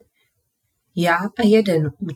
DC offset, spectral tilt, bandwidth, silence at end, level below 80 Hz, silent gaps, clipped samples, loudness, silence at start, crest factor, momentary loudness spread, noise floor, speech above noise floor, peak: under 0.1%; -6.5 dB/octave; 18 kHz; 0 s; -62 dBFS; none; under 0.1%; -18 LUFS; 0.95 s; 16 dB; 7 LU; -72 dBFS; 54 dB; -4 dBFS